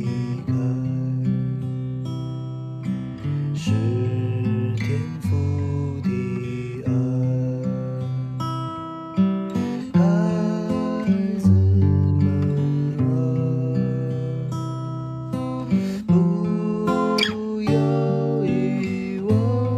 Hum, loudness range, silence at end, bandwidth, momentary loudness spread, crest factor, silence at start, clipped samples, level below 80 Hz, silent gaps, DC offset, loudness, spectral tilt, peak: none; 5 LU; 0 s; 10 kHz; 9 LU; 14 dB; 0 s; under 0.1%; -54 dBFS; none; under 0.1%; -23 LUFS; -8 dB/octave; -6 dBFS